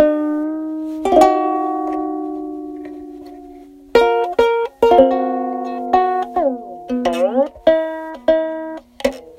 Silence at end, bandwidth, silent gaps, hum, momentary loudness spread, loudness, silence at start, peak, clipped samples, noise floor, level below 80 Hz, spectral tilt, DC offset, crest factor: 0.05 s; 16 kHz; none; none; 17 LU; -17 LUFS; 0 s; 0 dBFS; under 0.1%; -40 dBFS; -48 dBFS; -5 dB/octave; under 0.1%; 18 dB